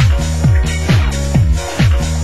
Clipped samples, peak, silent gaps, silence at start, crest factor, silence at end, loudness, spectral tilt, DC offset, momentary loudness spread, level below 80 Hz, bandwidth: under 0.1%; 0 dBFS; none; 0 s; 12 dB; 0 s; -14 LUFS; -5.5 dB/octave; 3%; 1 LU; -16 dBFS; 12.5 kHz